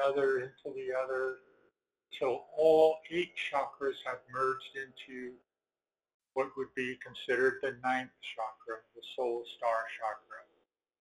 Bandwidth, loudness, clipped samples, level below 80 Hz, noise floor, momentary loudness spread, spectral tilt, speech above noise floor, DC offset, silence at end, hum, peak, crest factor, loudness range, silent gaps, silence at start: 12 kHz; -34 LUFS; under 0.1%; -76 dBFS; under -90 dBFS; 16 LU; -4.5 dB/octave; over 56 dB; under 0.1%; 0.6 s; none; -14 dBFS; 20 dB; 7 LU; 6.14-6.20 s; 0 s